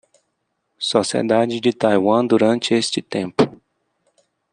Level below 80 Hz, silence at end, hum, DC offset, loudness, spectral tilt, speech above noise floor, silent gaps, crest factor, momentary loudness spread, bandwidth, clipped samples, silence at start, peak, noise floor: -64 dBFS; 0.95 s; none; under 0.1%; -18 LUFS; -4.5 dB/octave; 55 dB; none; 18 dB; 6 LU; 10.5 kHz; under 0.1%; 0.8 s; -2 dBFS; -73 dBFS